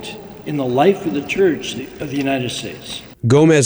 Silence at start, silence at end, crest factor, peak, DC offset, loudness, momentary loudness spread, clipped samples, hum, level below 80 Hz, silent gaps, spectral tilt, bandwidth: 0 s; 0 s; 16 dB; -2 dBFS; under 0.1%; -18 LUFS; 15 LU; under 0.1%; none; -50 dBFS; none; -5.5 dB/octave; over 20 kHz